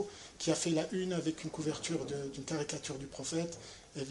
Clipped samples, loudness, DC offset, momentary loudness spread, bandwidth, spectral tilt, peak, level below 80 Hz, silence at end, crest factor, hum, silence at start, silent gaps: under 0.1%; -37 LUFS; under 0.1%; 9 LU; 11.5 kHz; -4.5 dB/octave; -18 dBFS; -64 dBFS; 0 s; 20 dB; none; 0 s; none